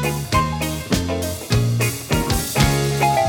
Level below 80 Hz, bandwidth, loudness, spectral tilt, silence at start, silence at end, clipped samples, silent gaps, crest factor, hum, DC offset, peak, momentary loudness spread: -32 dBFS; 18.5 kHz; -20 LUFS; -4.5 dB/octave; 0 s; 0 s; under 0.1%; none; 18 dB; none; under 0.1%; -2 dBFS; 5 LU